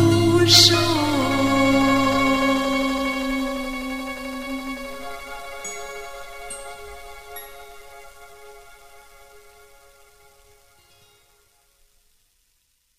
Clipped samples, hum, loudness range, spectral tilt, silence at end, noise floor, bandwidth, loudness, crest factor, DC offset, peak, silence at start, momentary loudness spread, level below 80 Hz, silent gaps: under 0.1%; none; 25 LU; -3.5 dB/octave; 3.9 s; -67 dBFS; 15.5 kHz; -19 LUFS; 22 dB; under 0.1%; -2 dBFS; 0 s; 24 LU; -46 dBFS; none